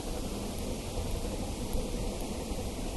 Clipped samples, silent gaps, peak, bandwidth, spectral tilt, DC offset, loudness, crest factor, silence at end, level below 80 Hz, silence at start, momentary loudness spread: under 0.1%; none; -18 dBFS; 12 kHz; -5 dB/octave; under 0.1%; -37 LUFS; 16 dB; 0 s; -38 dBFS; 0 s; 1 LU